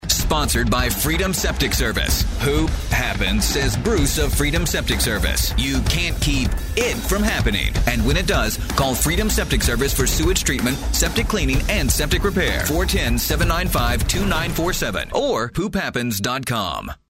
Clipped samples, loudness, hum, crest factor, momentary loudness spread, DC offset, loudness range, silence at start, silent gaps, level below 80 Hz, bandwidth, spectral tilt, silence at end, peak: under 0.1%; -20 LUFS; none; 16 dB; 3 LU; under 0.1%; 1 LU; 0 s; none; -24 dBFS; 16.5 kHz; -4 dB/octave; 0.15 s; -4 dBFS